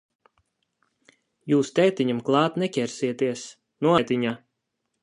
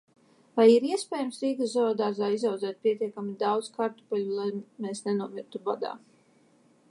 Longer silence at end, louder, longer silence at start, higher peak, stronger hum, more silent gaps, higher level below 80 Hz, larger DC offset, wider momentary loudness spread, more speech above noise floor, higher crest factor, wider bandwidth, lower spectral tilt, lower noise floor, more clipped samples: second, 0.65 s vs 0.95 s; first, -24 LUFS vs -28 LUFS; first, 1.45 s vs 0.55 s; about the same, -6 dBFS vs -8 dBFS; neither; neither; first, -70 dBFS vs -84 dBFS; neither; about the same, 14 LU vs 13 LU; first, 56 dB vs 35 dB; about the same, 20 dB vs 20 dB; about the same, 11 kHz vs 11.5 kHz; about the same, -5.5 dB/octave vs -5.5 dB/octave; first, -79 dBFS vs -62 dBFS; neither